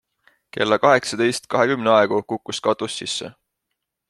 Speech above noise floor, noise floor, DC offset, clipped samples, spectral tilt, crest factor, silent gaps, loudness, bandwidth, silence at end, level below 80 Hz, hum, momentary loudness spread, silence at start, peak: 60 dB; -79 dBFS; under 0.1%; under 0.1%; -4 dB/octave; 20 dB; none; -20 LUFS; 12.5 kHz; 0.8 s; -64 dBFS; none; 11 LU; 0.55 s; -2 dBFS